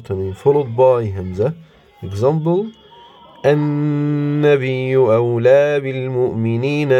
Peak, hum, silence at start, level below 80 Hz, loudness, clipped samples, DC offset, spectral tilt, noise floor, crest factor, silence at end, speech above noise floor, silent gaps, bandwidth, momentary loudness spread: -2 dBFS; none; 0 s; -58 dBFS; -16 LUFS; under 0.1%; under 0.1%; -8.5 dB/octave; -43 dBFS; 14 dB; 0 s; 27 dB; none; 9.6 kHz; 8 LU